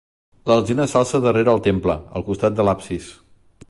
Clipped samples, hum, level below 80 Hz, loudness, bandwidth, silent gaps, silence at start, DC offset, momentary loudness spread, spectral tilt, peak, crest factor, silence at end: under 0.1%; none; -42 dBFS; -19 LUFS; 11.5 kHz; none; 0.45 s; under 0.1%; 10 LU; -6.5 dB/octave; -4 dBFS; 16 dB; 0.6 s